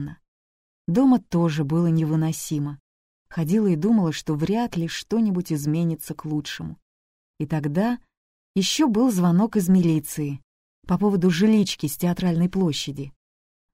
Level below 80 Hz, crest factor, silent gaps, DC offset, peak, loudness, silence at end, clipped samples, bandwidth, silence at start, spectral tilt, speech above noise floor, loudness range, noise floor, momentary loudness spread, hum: -54 dBFS; 14 dB; 0.28-0.85 s, 2.80-3.26 s, 6.82-7.34 s, 8.17-8.54 s, 10.44-10.82 s; under 0.1%; -8 dBFS; -23 LUFS; 0.65 s; under 0.1%; 16 kHz; 0 s; -6 dB/octave; over 68 dB; 5 LU; under -90 dBFS; 13 LU; none